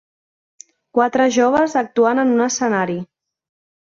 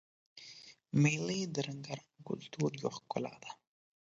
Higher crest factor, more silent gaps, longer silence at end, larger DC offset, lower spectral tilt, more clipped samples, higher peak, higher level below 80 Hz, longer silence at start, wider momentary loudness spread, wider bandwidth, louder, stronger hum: about the same, 16 dB vs 20 dB; neither; first, 0.95 s vs 0.5 s; neither; about the same, -4.5 dB/octave vs -5.5 dB/octave; neither; first, -4 dBFS vs -18 dBFS; first, -62 dBFS vs -76 dBFS; first, 0.95 s vs 0.35 s; second, 8 LU vs 21 LU; about the same, 7.6 kHz vs 7.8 kHz; first, -17 LUFS vs -37 LUFS; neither